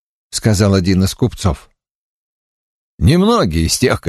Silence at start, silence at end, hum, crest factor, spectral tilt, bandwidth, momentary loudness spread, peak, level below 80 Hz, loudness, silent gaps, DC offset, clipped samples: 0.35 s; 0 s; none; 16 dB; -5.5 dB/octave; 13 kHz; 8 LU; 0 dBFS; -30 dBFS; -14 LUFS; 1.91-2.98 s; under 0.1%; under 0.1%